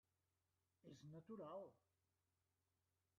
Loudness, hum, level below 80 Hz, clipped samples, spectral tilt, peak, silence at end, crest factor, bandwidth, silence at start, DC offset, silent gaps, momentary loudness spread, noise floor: -59 LUFS; none; under -90 dBFS; under 0.1%; -7.5 dB/octave; -44 dBFS; 1.4 s; 18 dB; 6 kHz; 0.85 s; under 0.1%; none; 9 LU; under -90 dBFS